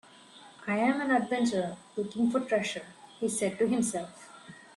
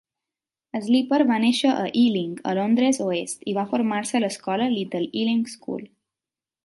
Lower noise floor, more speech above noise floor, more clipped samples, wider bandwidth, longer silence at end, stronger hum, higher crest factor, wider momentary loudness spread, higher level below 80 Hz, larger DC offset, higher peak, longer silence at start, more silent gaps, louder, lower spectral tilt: second, -53 dBFS vs under -90 dBFS; second, 24 dB vs over 68 dB; neither; about the same, 12.5 kHz vs 11.5 kHz; second, 0.15 s vs 0.8 s; neither; about the same, 16 dB vs 16 dB; first, 17 LU vs 10 LU; about the same, -72 dBFS vs -72 dBFS; neither; second, -14 dBFS vs -6 dBFS; second, 0.35 s vs 0.75 s; neither; second, -30 LUFS vs -23 LUFS; about the same, -4.5 dB/octave vs -4.5 dB/octave